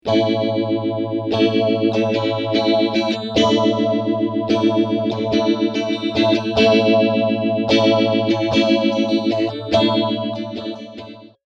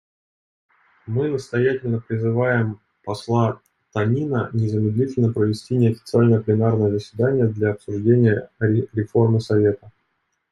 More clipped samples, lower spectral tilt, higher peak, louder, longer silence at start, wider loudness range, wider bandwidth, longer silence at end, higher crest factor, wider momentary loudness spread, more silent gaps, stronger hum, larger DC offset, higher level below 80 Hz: neither; second, -6 dB/octave vs -8.5 dB/octave; about the same, -2 dBFS vs -4 dBFS; first, -18 LUFS vs -21 LUFS; second, 0.05 s vs 1.05 s; about the same, 2 LU vs 4 LU; second, 7.6 kHz vs 10.5 kHz; second, 0.25 s vs 0.6 s; about the same, 16 dB vs 16 dB; about the same, 7 LU vs 7 LU; neither; neither; neither; about the same, -54 dBFS vs -58 dBFS